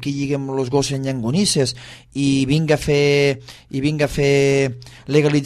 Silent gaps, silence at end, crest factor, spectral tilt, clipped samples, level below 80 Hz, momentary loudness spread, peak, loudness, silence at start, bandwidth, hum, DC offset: none; 0 s; 16 dB; -5.5 dB/octave; under 0.1%; -44 dBFS; 8 LU; -2 dBFS; -18 LUFS; 0 s; 13 kHz; none; under 0.1%